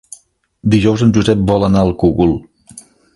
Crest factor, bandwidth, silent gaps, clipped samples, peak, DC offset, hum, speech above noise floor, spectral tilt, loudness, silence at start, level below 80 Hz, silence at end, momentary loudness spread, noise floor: 14 dB; 11.5 kHz; none; under 0.1%; 0 dBFS; under 0.1%; none; 37 dB; -7 dB/octave; -13 LUFS; 0.65 s; -32 dBFS; 0.35 s; 4 LU; -49 dBFS